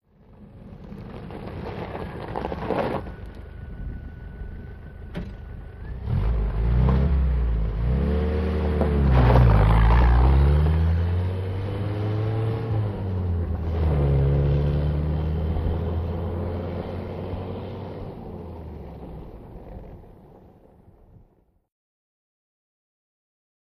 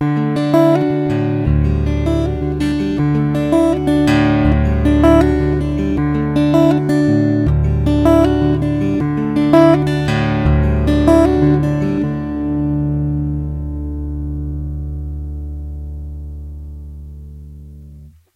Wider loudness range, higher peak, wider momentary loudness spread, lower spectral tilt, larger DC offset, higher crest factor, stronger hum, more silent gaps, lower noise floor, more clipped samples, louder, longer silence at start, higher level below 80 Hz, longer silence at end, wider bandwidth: first, 17 LU vs 12 LU; second, -6 dBFS vs 0 dBFS; first, 21 LU vs 16 LU; about the same, -9.5 dB/octave vs -8.5 dB/octave; neither; about the same, 18 dB vs 14 dB; neither; neither; first, -60 dBFS vs -39 dBFS; neither; second, -24 LUFS vs -15 LUFS; first, 0.4 s vs 0 s; about the same, -26 dBFS vs -24 dBFS; first, 3.6 s vs 0.25 s; second, 5.4 kHz vs 12.5 kHz